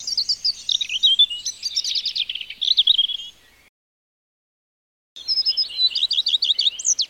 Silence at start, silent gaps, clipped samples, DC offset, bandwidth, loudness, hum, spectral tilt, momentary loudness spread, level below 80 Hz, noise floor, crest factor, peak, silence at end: 0 s; 3.69-5.16 s; under 0.1%; under 0.1%; 16.5 kHz; -18 LUFS; none; 4.5 dB/octave; 10 LU; -64 dBFS; -40 dBFS; 16 dB; -6 dBFS; 0.05 s